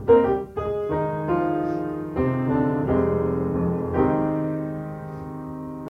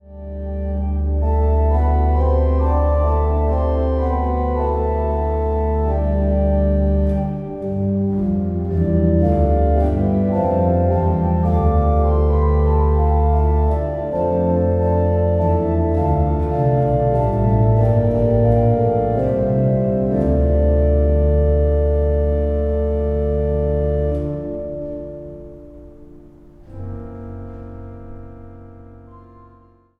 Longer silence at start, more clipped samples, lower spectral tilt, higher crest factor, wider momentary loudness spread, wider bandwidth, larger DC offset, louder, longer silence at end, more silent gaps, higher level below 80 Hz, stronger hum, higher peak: about the same, 0 s vs 0.05 s; neither; second, -10 dB/octave vs -12 dB/octave; about the same, 18 dB vs 14 dB; about the same, 12 LU vs 12 LU; first, 5.6 kHz vs 3.1 kHz; neither; second, -24 LUFS vs -18 LUFS; second, 0.05 s vs 0.8 s; neither; second, -44 dBFS vs -22 dBFS; neither; about the same, -4 dBFS vs -4 dBFS